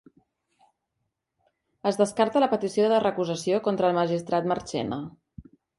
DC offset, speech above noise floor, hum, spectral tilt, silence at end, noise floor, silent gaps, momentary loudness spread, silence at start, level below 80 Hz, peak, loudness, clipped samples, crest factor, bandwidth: under 0.1%; 56 dB; none; -5.5 dB/octave; 0.35 s; -80 dBFS; none; 8 LU; 1.85 s; -64 dBFS; -8 dBFS; -25 LUFS; under 0.1%; 18 dB; 11.5 kHz